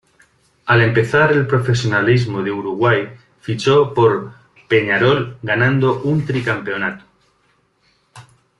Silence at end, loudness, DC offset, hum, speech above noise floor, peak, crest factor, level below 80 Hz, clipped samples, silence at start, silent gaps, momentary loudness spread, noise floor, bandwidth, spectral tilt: 0.4 s; -16 LUFS; under 0.1%; none; 45 dB; -2 dBFS; 16 dB; -52 dBFS; under 0.1%; 0.65 s; none; 10 LU; -61 dBFS; 11 kHz; -6.5 dB/octave